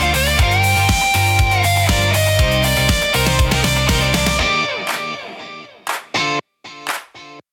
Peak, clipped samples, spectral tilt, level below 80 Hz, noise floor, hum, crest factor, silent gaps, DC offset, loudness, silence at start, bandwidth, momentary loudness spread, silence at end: -4 dBFS; under 0.1%; -3.5 dB/octave; -26 dBFS; -39 dBFS; none; 12 dB; none; under 0.1%; -16 LUFS; 0 s; 18 kHz; 12 LU; 0.1 s